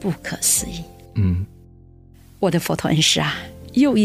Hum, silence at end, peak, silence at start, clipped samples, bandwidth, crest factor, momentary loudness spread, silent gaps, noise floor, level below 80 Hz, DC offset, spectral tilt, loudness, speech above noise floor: none; 0 s; -4 dBFS; 0 s; under 0.1%; 16 kHz; 18 dB; 14 LU; none; -46 dBFS; -44 dBFS; under 0.1%; -4 dB/octave; -20 LUFS; 27 dB